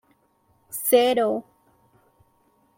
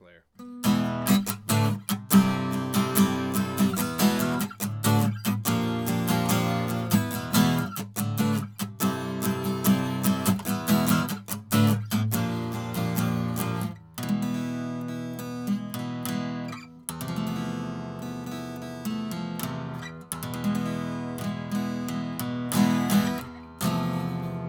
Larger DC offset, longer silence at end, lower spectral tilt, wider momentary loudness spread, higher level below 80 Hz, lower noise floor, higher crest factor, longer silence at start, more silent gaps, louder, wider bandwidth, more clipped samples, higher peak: neither; first, 1.35 s vs 0 s; second, -2.5 dB/octave vs -5.5 dB/octave; about the same, 14 LU vs 12 LU; second, -74 dBFS vs -62 dBFS; first, -65 dBFS vs -47 dBFS; about the same, 20 dB vs 24 dB; first, 0.7 s vs 0.4 s; neither; first, -21 LUFS vs -27 LUFS; second, 16.5 kHz vs over 20 kHz; neither; second, -6 dBFS vs -2 dBFS